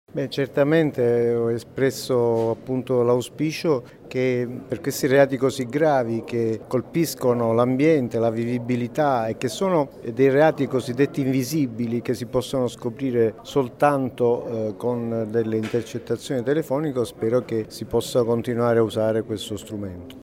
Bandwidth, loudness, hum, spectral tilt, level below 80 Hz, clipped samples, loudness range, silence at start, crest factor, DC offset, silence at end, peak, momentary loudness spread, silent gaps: 16 kHz; -23 LUFS; none; -6.5 dB/octave; -56 dBFS; under 0.1%; 3 LU; 0.15 s; 18 dB; under 0.1%; 0 s; -4 dBFS; 8 LU; none